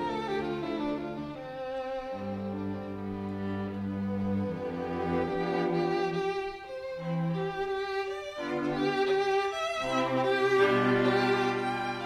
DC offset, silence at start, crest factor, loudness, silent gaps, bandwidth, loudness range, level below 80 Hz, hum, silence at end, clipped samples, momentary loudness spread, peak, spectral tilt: under 0.1%; 0 s; 18 dB; -31 LUFS; none; 11.5 kHz; 8 LU; -58 dBFS; none; 0 s; under 0.1%; 11 LU; -12 dBFS; -6.5 dB/octave